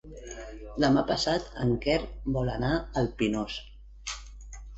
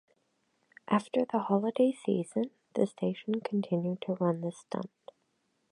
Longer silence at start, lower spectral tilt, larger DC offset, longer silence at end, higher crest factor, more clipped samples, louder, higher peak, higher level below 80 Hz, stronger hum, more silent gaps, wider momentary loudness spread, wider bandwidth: second, 0.05 s vs 0.9 s; second, -5.5 dB/octave vs -7.5 dB/octave; neither; second, 0 s vs 0.85 s; about the same, 18 dB vs 22 dB; neither; first, -29 LUFS vs -32 LUFS; about the same, -12 dBFS vs -10 dBFS; first, -42 dBFS vs -80 dBFS; neither; neither; first, 17 LU vs 8 LU; second, 8.2 kHz vs 11 kHz